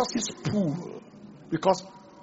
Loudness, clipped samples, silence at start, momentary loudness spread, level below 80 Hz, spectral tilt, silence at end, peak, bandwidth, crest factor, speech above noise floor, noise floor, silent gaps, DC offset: -28 LUFS; under 0.1%; 0 s; 22 LU; -62 dBFS; -5.5 dB/octave; 0 s; -8 dBFS; 8 kHz; 22 dB; 20 dB; -48 dBFS; none; under 0.1%